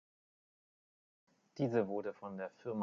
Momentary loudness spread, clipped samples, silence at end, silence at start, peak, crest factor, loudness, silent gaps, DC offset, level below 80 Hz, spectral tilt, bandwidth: 10 LU; under 0.1%; 0 s; 1.55 s; -20 dBFS; 22 dB; -39 LUFS; none; under 0.1%; -82 dBFS; -7.5 dB/octave; 7.2 kHz